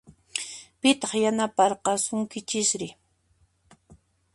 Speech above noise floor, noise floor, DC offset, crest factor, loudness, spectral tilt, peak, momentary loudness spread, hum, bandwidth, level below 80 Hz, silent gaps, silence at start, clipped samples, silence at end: 41 dB; -66 dBFS; under 0.1%; 22 dB; -25 LUFS; -2.5 dB/octave; -6 dBFS; 11 LU; none; 11.5 kHz; -66 dBFS; none; 0.35 s; under 0.1%; 0.4 s